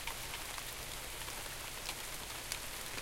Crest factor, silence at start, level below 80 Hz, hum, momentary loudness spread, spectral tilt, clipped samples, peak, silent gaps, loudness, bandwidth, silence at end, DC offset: 24 dB; 0 s; -54 dBFS; none; 2 LU; -1 dB/octave; under 0.1%; -20 dBFS; none; -42 LUFS; 17 kHz; 0 s; under 0.1%